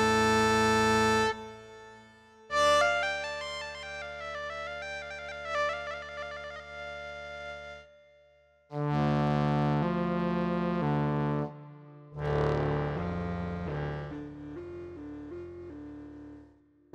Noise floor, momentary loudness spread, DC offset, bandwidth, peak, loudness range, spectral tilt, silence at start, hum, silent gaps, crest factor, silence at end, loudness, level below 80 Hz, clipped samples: -63 dBFS; 21 LU; under 0.1%; 15 kHz; -12 dBFS; 10 LU; -5.5 dB/octave; 0 s; none; none; 18 dB; 0.5 s; -30 LUFS; -52 dBFS; under 0.1%